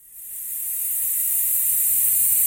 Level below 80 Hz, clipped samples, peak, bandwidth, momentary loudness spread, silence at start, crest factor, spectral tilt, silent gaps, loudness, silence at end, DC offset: -60 dBFS; under 0.1%; -6 dBFS; 17 kHz; 13 LU; 0.1 s; 14 dB; 2 dB/octave; none; -18 LUFS; 0 s; under 0.1%